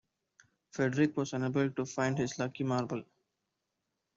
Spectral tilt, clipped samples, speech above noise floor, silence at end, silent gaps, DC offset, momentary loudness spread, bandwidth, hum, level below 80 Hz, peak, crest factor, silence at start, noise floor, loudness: -6 dB/octave; under 0.1%; 53 dB; 1.15 s; none; under 0.1%; 7 LU; 7.8 kHz; none; -72 dBFS; -16 dBFS; 20 dB; 0.75 s; -85 dBFS; -33 LUFS